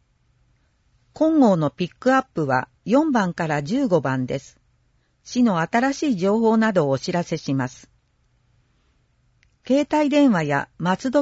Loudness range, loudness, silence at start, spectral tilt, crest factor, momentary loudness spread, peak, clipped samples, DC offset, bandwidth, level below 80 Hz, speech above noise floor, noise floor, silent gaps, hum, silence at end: 4 LU; -21 LUFS; 1.15 s; -6.5 dB/octave; 16 dB; 8 LU; -4 dBFS; under 0.1%; under 0.1%; 8 kHz; -60 dBFS; 44 dB; -64 dBFS; none; none; 0 s